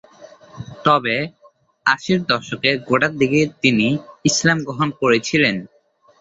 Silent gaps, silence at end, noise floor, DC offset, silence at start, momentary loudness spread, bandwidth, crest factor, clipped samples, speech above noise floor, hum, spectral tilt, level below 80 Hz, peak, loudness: none; 0.55 s; -44 dBFS; under 0.1%; 0.2 s; 7 LU; 8 kHz; 18 dB; under 0.1%; 26 dB; none; -4 dB/octave; -56 dBFS; -2 dBFS; -18 LUFS